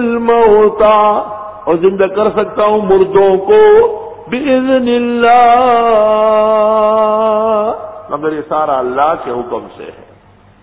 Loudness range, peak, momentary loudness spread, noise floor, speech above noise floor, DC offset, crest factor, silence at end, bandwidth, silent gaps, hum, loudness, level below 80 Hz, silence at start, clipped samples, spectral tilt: 5 LU; 0 dBFS; 13 LU; -43 dBFS; 33 dB; under 0.1%; 10 dB; 0.7 s; 4 kHz; none; none; -10 LUFS; -44 dBFS; 0 s; under 0.1%; -9.5 dB/octave